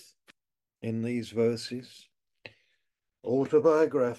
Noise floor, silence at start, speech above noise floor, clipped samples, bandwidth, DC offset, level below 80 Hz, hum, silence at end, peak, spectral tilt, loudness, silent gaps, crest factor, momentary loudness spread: -89 dBFS; 0.85 s; 62 dB; under 0.1%; 12 kHz; under 0.1%; -74 dBFS; none; 0 s; -12 dBFS; -6.5 dB/octave; -28 LUFS; none; 18 dB; 17 LU